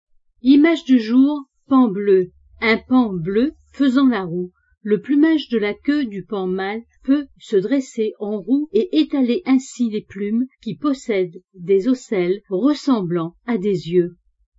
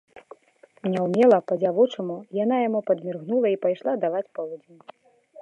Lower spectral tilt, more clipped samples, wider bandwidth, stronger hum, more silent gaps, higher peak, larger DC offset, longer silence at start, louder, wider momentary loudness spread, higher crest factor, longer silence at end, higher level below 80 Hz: second, -6.5 dB/octave vs -8 dB/octave; neither; about the same, 8 kHz vs 8 kHz; neither; neither; first, -2 dBFS vs -6 dBFS; neither; first, 0.45 s vs 0.15 s; first, -19 LUFS vs -24 LUFS; second, 10 LU vs 14 LU; about the same, 16 dB vs 18 dB; first, 0.5 s vs 0 s; first, -56 dBFS vs -78 dBFS